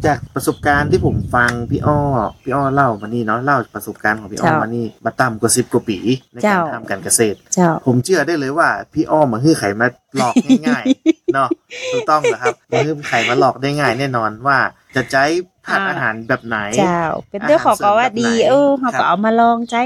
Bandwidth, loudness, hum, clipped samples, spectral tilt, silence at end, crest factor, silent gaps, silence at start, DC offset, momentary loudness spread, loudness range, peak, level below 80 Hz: 15 kHz; -16 LUFS; none; under 0.1%; -5 dB/octave; 0 s; 16 dB; none; 0 s; under 0.1%; 7 LU; 2 LU; 0 dBFS; -44 dBFS